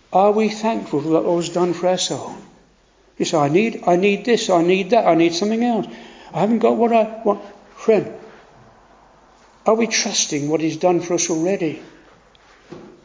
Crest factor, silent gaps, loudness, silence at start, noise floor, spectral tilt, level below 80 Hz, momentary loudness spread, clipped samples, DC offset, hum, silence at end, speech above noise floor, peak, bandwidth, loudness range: 18 dB; none; -18 LUFS; 0.1 s; -55 dBFS; -4.5 dB/octave; -60 dBFS; 10 LU; under 0.1%; under 0.1%; none; 0.15 s; 37 dB; -2 dBFS; 7.6 kHz; 4 LU